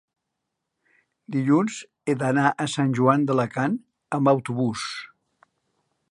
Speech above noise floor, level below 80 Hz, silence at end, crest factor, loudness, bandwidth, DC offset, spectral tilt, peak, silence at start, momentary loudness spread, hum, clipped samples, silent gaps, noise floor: 59 dB; -68 dBFS; 1.05 s; 22 dB; -23 LUFS; 11.5 kHz; under 0.1%; -6 dB/octave; -4 dBFS; 1.3 s; 11 LU; none; under 0.1%; none; -81 dBFS